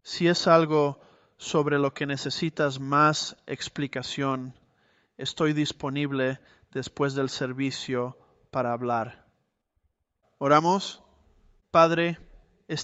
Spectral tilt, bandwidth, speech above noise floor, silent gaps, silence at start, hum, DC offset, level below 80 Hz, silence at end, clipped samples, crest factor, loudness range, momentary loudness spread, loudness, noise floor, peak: -5 dB/octave; 8.2 kHz; 49 dB; none; 0.05 s; none; under 0.1%; -64 dBFS; 0 s; under 0.1%; 22 dB; 6 LU; 15 LU; -26 LUFS; -75 dBFS; -6 dBFS